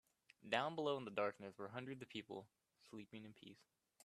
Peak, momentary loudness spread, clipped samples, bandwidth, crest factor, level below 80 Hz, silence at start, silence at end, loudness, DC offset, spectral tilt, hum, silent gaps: -22 dBFS; 18 LU; under 0.1%; 13.5 kHz; 26 dB; -88 dBFS; 0.45 s; 0.5 s; -46 LUFS; under 0.1%; -5 dB/octave; none; none